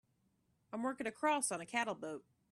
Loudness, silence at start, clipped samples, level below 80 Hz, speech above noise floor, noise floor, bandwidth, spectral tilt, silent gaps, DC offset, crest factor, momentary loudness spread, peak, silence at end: -38 LUFS; 0.7 s; under 0.1%; -84 dBFS; 39 dB; -78 dBFS; 13 kHz; -2.5 dB/octave; none; under 0.1%; 20 dB; 13 LU; -22 dBFS; 0.3 s